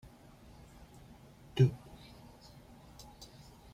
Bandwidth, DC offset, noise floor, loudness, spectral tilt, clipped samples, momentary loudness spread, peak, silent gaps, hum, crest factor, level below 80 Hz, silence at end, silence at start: 12 kHz; under 0.1%; -57 dBFS; -32 LUFS; -7.5 dB/octave; under 0.1%; 27 LU; -16 dBFS; none; none; 24 dB; -62 dBFS; 2 s; 1.55 s